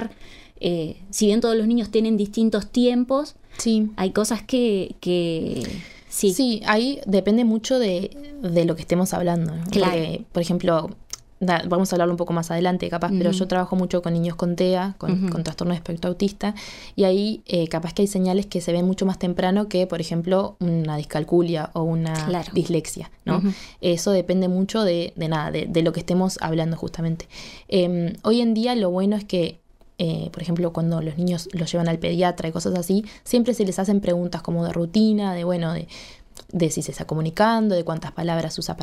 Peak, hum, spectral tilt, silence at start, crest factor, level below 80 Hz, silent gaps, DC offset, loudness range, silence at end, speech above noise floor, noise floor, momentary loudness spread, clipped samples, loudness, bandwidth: -4 dBFS; none; -6 dB/octave; 0 s; 18 dB; -48 dBFS; none; under 0.1%; 2 LU; 0 s; 21 dB; -43 dBFS; 8 LU; under 0.1%; -23 LUFS; 15 kHz